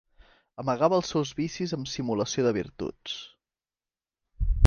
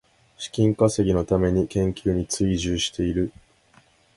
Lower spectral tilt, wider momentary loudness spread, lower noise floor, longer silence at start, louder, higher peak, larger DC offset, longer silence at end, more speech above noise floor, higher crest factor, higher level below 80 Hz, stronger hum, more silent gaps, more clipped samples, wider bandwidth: about the same, -5.5 dB/octave vs -5.5 dB/octave; first, 13 LU vs 7 LU; first, under -90 dBFS vs -58 dBFS; first, 0.6 s vs 0.4 s; second, -29 LUFS vs -23 LUFS; about the same, -4 dBFS vs -4 dBFS; neither; second, 0 s vs 0.85 s; first, over 62 dB vs 36 dB; about the same, 24 dB vs 20 dB; about the same, -38 dBFS vs -40 dBFS; neither; neither; neither; second, 7.2 kHz vs 11.5 kHz